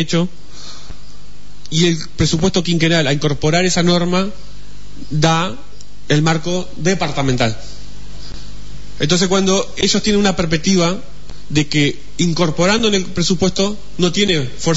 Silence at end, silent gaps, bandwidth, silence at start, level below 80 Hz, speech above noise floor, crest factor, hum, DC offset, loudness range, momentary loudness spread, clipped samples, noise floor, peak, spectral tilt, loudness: 0 s; none; 8 kHz; 0 s; -36 dBFS; 24 dB; 14 dB; none; 8%; 3 LU; 21 LU; under 0.1%; -40 dBFS; -2 dBFS; -4.5 dB/octave; -16 LUFS